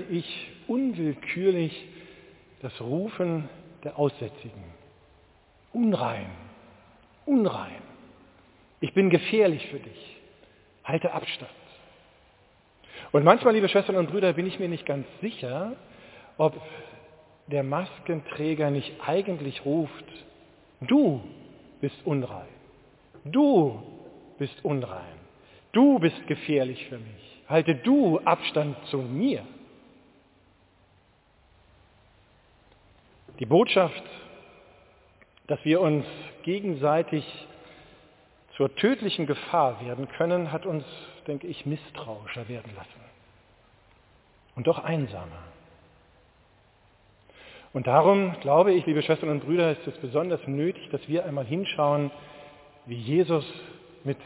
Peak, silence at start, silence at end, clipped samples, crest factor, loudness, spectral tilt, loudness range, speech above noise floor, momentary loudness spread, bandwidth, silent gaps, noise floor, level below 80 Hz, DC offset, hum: -2 dBFS; 0 s; 0 s; under 0.1%; 26 dB; -26 LUFS; -10.5 dB/octave; 10 LU; 36 dB; 23 LU; 4 kHz; none; -62 dBFS; -64 dBFS; under 0.1%; none